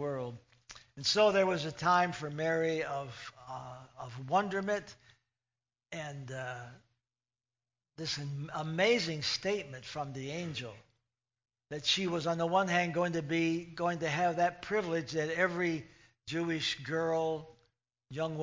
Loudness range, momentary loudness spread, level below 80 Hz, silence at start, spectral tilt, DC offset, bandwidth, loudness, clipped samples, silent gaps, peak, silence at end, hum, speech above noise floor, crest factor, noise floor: 7 LU; 17 LU; -70 dBFS; 0 s; -4.5 dB/octave; under 0.1%; 7.6 kHz; -33 LUFS; under 0.1%; none; -16 dBFS; 0 s; none; over 57 dB; 20 dB; under -90 dBFS